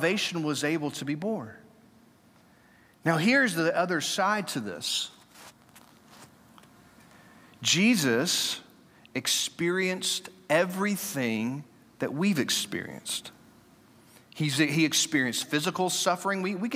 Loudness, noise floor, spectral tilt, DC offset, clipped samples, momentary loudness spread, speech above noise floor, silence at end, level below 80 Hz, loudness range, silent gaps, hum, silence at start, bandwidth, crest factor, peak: -27 LUFS; -59 dBFS; -3.5 dB/octave; under 0.1%; under 0.1%; 11 LU; 32 dB; 0 s; -76 dBFS; 5 LU; none; none; 0 s; 16.5 kHz; 20 dB; -10 dBFS